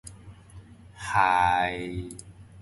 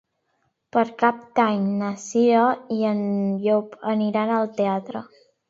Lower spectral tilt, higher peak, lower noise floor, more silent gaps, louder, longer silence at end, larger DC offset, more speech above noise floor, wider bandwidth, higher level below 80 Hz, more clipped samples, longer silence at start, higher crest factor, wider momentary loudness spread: second, -4.5 dB/octave vs -6.5 dB/octave; second, -8 dBFS vs -4 dBFS; second, -48 dBFS vs -71 dBFS; neither; second, -25 LUFS vs -22 LUFS; second, 0 s vs 0.45 s; neither; second, 23 dB vs 50 dB; first, 11.5 kHz vs 7.8 kHz; first, -50 dBFS vs -72 dBFS; neither; second, 0.05 s vs 0.75 s; about the same, 20 dB vs 18 dB; first, 21 LU vs 7 LU